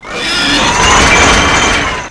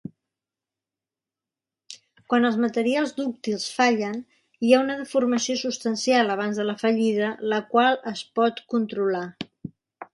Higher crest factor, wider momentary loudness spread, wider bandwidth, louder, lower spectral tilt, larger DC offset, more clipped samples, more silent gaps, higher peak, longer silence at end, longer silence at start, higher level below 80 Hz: second, 10 dB vs 22 dB; second, 6 LU vs 17 LU; about the same, 11 kHz vs 11.5 kHz; first, -7 LUFS vs -23 LUFS; second, -2 dB/octave vs -4 dB/octave; neither; neither; neither; first, 0 dBFS vs -4 dBFS; about the same, 0 s vs 0.1 s; second, 0 s vs 1.9 s; first, -22 dBFS vs -72 dBFS